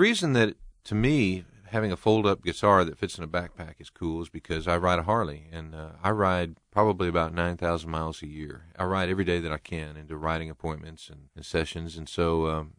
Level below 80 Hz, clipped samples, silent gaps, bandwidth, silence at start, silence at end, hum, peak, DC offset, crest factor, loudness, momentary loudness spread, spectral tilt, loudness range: -46 dBFS; under 0.1%; none; 15 kHz; 0 s; 0.05 s; none; -6 dBFS; under 0.1%; 22 dB; -27 LUFS; 17 LU; -6 dB/octave; 6 LU